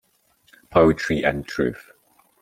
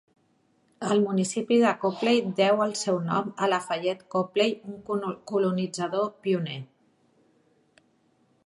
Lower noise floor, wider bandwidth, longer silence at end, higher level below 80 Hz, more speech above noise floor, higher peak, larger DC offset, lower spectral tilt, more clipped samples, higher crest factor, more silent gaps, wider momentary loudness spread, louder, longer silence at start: second, -62 dBFS vs -67 dBFS; first, 15.5 kHz vs 11.5 kHz; second, 0.65 s vs 1.8 s; first, -46 dBFS vs -74 dBFS; about the same, 42 dB vs 42 dB; first, -2 dBFS vs -8 dBFS; neither; first, -6.5 dB/octave vs -5 dB/octave; neither; about the same, 22 dB vs 18 dB; neither; about the same, 9 LU vs 8 LU; first, -21 LUFS vs -26 LUFS; about the same, 0.7 s vs 0.8 s